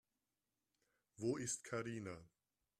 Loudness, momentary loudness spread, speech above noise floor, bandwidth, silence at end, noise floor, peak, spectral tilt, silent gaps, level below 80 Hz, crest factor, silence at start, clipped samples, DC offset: -45 LUFS; 10 LU; over 45 dB; 13.5 kHz; 0.55 s; under -90 dBFS; -28 dBFS; -4.5 dB/octave; none; -80 dBFS; 20 dB; 1.2 s; under 0.1%; under 0.1%